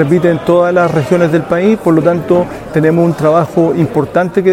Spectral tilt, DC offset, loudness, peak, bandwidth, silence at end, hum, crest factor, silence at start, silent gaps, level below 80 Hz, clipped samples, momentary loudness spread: -8 dB/octave; under 0.1%; -11 LUFS; 0 dBFS; 15.5 kHz; 0 s; none; 10 dB; 0 s; none; -42 dBFS; 0.2%; 3 LU